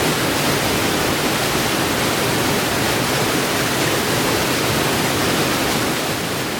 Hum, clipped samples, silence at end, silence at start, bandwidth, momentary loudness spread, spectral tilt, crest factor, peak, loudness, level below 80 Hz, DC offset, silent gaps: none; under 0.1%; 0 s; 0 s; 19 kHz; 1 LU; -3 dB/octave; 14 dB; -6 dBFS; -18 LUFS; -40 dBFS; under 0.1%; none